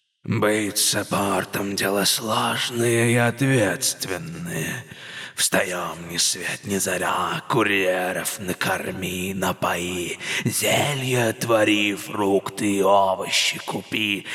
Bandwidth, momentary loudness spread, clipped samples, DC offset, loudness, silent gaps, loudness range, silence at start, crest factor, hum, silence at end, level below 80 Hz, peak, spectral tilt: 18 kHz; 9 LU; under 0.1%; under 0.1%; -22 LUFS; none; 3 LU; 0.25 s; 16 dB; none; 0 s; -66 dBFS; -6 dBFS; -3.5 dB/octave